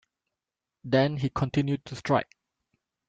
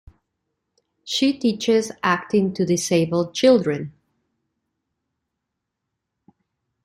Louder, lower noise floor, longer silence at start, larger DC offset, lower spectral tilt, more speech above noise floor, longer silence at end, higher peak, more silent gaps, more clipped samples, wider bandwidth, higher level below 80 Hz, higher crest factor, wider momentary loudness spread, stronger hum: second, -27 LUFS vs -20 LUFS; first, -88 dBFS vs -81 dBFS; second, 0.85 s vs 1.05 s; neither; first, -7 dB/octave vs -5 dB/octave; about the same, 62 dB vs 61 dB; second, 0.85 s vs 2.95 s; second, -10 dBFS vs -4 dBFS; neither; neither; second, 7.8 kHz vs 16 kHz; about the same, -58 dBFS vs -62 dBFS; about the same, 20 dB vs 18 dB; about the same, 12 LU vs 10 LU; neither